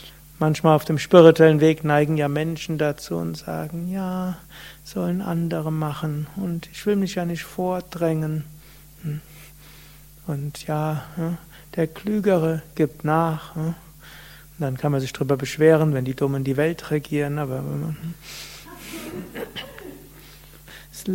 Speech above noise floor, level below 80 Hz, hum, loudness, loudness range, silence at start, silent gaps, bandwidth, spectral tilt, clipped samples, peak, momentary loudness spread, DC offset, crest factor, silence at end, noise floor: 25 dB; -50 dBFS; none; -22 LUFS; 12 LU; 0 s; none; 16.5 kHz; -7 dB/octave; under 0.1%; 0 dBFS; 19 LU; under 0.1%; 22 dB; 0 s; -46 dBFS